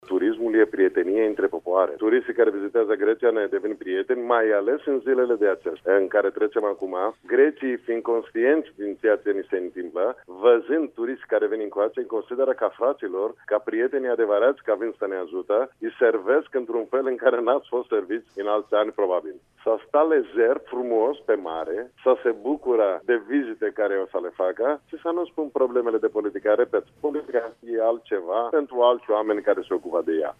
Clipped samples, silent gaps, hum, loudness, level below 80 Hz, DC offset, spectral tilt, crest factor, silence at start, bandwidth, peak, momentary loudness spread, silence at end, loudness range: under 0.1%; none; none; -24 LUFS; -70 dBFS; under 0.1%; -6.5 dB/octave; 18 dB; 0.1 s; 3.7 kHz; -6 dBFS; 8 LU; 0.05 s; 2 LU